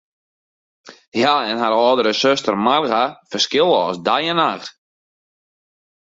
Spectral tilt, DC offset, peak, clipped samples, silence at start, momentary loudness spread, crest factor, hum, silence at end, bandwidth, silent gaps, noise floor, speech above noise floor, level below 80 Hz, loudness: -3.5 dB/octave; under 0.1%; -2 dBFS; under 0.1%; 0.85 s; 6 LU; 18 dB; none; 1.4 s; 7.8 kHz; 1.08-1.12 s; under -90 dBFS; over 73 dB; -64 dBFS; -17 LUFS